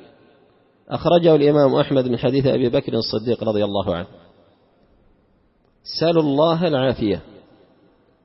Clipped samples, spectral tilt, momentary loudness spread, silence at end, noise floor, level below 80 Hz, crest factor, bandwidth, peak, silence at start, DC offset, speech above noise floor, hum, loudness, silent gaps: under 0.1%; -9.5 dB/octave; 13 LU; 1 s; -60 dBFS; -50 dBFS; 18 dB; 6 kHz; -2 dBFS; 0.9 s; under 0.1%; 42 dB; none; -19 LUFS; none